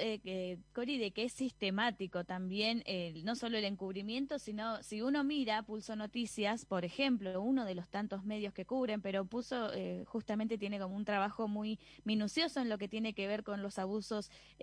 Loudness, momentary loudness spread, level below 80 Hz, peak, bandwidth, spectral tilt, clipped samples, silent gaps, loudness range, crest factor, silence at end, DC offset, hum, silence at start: -38 LUFS; 7 LU; -70 dBFS; -20 dBFS; 10.5 kHz; -5 dB/octave; under 0.1%; none; 2 LU; 18 dB; 0 s; under 0.1%; none; 0 s